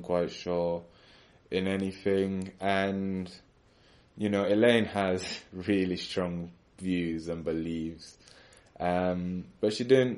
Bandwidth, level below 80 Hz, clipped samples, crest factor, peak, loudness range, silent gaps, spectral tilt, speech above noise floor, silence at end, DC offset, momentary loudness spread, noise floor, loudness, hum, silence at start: 11.5 kHz; -60 dBFS; under 0.1%; 20 dB; -10 dBFS; 5 LU; none; -6 dB/octave; 32 dB; 0 s; under 0.1%; 13 LU; -61 dBFS; -30 LUFS; none; 0 s